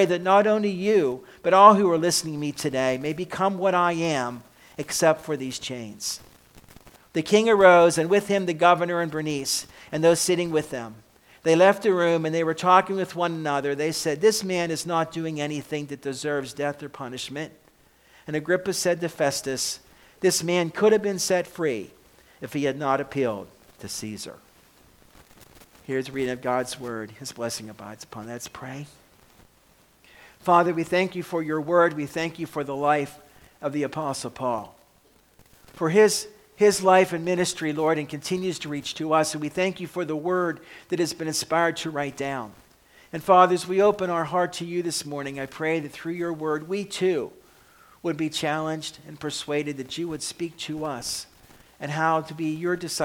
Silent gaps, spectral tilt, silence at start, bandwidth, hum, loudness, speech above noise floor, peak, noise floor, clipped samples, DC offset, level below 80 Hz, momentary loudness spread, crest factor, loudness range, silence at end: none; -4 dB/octave; 0 s; 18.5 kHz; none; -24 LUFS; 36 dB; 0 dBFS; -59 dBFS; under 0.1%; under 0.1%; -62 dBFS; 15 LU; 24 dB; 11 LU; 0 s